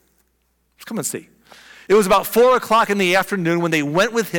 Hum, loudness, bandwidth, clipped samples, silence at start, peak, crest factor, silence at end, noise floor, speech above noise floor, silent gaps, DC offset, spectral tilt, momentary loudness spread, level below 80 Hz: none; -17 LUFS; 18 kHz; under 0.1%; 0.8 s; -8 dBFS; 12 dB; 0 s; -66 dBFS; 49 dB; none; under 0.1%; -4.5 dB/octave; 11 LU; -52 dBFS